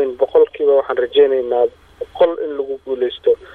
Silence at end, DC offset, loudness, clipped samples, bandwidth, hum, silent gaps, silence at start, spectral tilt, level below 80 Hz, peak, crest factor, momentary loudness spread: 0.1 s; under 0.1%; -16 LUFS; under 0.1%; 4.2 kHz; none; none; 0 s; -6 dB/octave; -54 dBFS; -2 dBFS; 14 dB; 10 LU